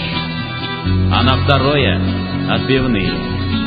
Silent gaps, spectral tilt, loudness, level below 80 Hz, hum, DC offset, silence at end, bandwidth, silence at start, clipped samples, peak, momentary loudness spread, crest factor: none; -9 dB/octave; -16 LUFS; -26 dBFS; none; under 0.1%; 0 s; 5 kHz; 0 s; under 0.1%; 0 dBFS; 8 LU; 16 dB